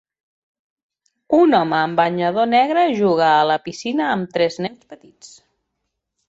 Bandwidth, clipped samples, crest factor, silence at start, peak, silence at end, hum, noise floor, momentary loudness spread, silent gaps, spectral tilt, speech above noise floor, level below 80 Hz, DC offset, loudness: 8 kHz; under 0.1%; 16 dB; 1.3 s; -2 dBFS; 1 s; none; -77 dBFS; 7 LU; none; -5.5 dB/octave; 59 dB; -64 dBFS; under 0.1%; -17 LUFS